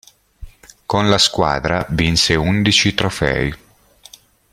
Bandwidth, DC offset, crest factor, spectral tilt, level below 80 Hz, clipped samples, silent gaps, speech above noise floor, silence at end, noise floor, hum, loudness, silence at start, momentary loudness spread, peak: 16 kHz; under 0.1%; 18 dB; -4 dB/octave; -36 dBFS; under 0.1%; none; 32 dB; 1 s; -48 dBFS; none; -16 LUFS; 0.4 s; 8 LU; 0 dBFS